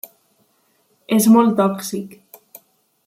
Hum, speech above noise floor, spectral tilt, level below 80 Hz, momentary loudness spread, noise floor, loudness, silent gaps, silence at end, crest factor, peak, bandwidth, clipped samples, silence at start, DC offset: none; 47 dB; -5.5 dB/octave; -68 dBFS; 22 LU; -62 dBFS; -16 LUFS; none; 0.9 s; 16 dB; -4 dBFS; 16 kHz; under 0.1%; 1.1 s; under 0.1%